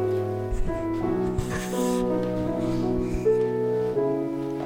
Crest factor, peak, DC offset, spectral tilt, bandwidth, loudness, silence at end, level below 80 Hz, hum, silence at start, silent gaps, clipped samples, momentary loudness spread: 12 dB; -12 dBFS; under 0.1%; -7 dB/octave; 17 kHz; -26 LUFS; 0 s; -36 dBFS; none; 0 s; none; under 0.1%; 5 LU